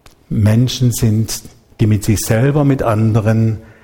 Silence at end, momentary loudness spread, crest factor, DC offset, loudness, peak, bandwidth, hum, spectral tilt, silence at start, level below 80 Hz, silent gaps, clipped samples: 0.2 s; 6 LU; 14 dB; under 0.1%; -15 LUFS; 0 dBFS; 17 kHz; none; -6.5 dB/octave; 0.3 s; -36 dBFS; none; under 0.1%